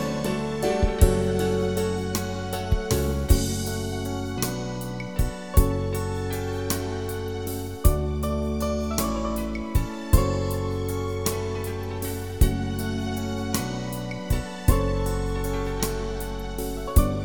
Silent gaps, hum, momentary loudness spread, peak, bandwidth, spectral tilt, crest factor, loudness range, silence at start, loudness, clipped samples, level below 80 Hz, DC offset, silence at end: none; none; 8 LU; -4 dBFS; 19 kHz; -5.5 dB/octave; 22 dB; 3 LU; 0 s; -27 LUFS; under 0.1%; -30 dBFS; 0.6%; 0 s